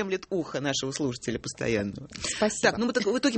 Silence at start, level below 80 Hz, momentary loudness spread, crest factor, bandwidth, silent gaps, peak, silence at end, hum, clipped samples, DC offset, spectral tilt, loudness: 0 s; -56 dBFS; 8 LU; 20 dB; 8.8 kHz; none; -8 dBFS; 0 s; none; under 0.1%; under 0.1%; -3.5 dB/octave; -28 LUFS